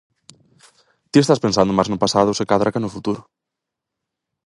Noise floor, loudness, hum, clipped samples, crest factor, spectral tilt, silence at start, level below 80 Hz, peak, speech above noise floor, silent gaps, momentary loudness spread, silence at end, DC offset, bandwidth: -83 dBFS; -18 LUFS; none; under 0.1%; 20 dB; -5.5 dB/octave; 1.15 s; -52 dBFS; 0 dBFS; 66 dB; none; 10 LU; 1.25 s; under 0.1%; 11.5 kHz